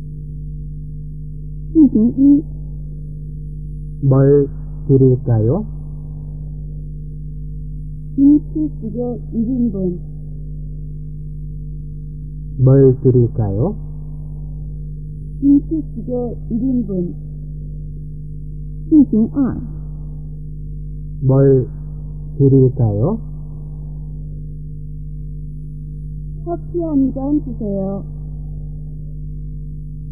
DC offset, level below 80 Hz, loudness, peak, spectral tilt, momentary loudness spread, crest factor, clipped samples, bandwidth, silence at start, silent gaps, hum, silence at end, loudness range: 2%; -30 dBFS; -16 LUFS; 0 dBFS; -15 dB/octave; 18 LU; 18 dB; under 0.1%; 1.8 kHz; 0 s; none; none; 0 s; 7 LU